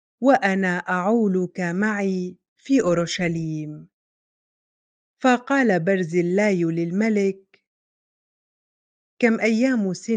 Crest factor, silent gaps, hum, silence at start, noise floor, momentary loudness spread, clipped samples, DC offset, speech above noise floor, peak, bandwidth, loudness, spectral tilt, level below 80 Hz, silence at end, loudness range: 20 dB; 2.48-2.56 s, 3.94-5.17 s, 7.67-9.17 s; none; 0.2 s; under -90 dBFS; 7 LU; under 0.1%; under 0.1%; over 69 dB; -4 dBFS; 9.4 kHz; -21 LUFS; -6 dB/octave; -64 dBFS; 0 s; 3 LU